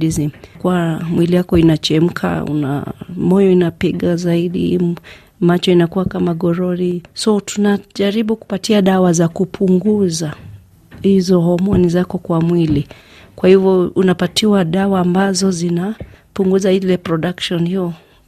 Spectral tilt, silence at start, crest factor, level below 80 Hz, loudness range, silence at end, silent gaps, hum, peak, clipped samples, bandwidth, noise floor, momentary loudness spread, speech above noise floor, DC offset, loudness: -6.5 dB/octave; 0 s; 14 dB; -42 dBFS; 2 LU; 0.3 s; none; none; 0 dBFS; under 0.1%; 14 kHz; -39 dBFS; 8 LU; 24 dB; under 0.1%; -15 LUFS